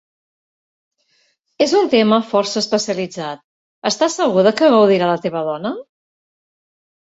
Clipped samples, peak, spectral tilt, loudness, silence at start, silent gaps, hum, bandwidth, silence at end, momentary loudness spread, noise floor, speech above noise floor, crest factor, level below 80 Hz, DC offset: under 0.1%; -2 dBFS; -4.5 dB/octave; -16 LUFS; 1.6 s; 3.44-3.82 s; none; 8 kHz; 1.35 s; 14 LU; -63 dBFS; 47 dB; 16 dB; -64 dBFS; under 0.1%